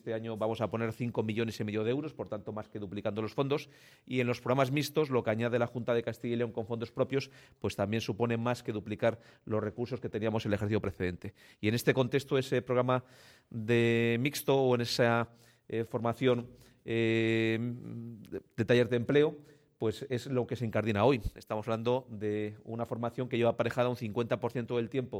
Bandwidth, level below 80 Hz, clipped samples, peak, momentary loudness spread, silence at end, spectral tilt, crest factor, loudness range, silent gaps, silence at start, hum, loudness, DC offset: 16.5 kHz; -58 dBFS; under 0.1%; -12 dBFS; 11 LU; 0 s; -6.5 dB/octave; 20 dB; 4 LU; none; 0.05 s; none; -32 LUFS; under 0.1%